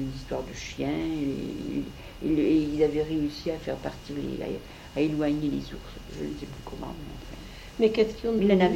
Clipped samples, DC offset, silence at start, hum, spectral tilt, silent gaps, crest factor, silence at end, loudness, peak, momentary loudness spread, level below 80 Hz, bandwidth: under 0.1%; under 0.1%; 0 s; none; -6.5 dB/octave; none; 20 dB; 0 s; -29 LUFS; -10 dBFS; 17 LU; -46 dBFS; 16.5 kHz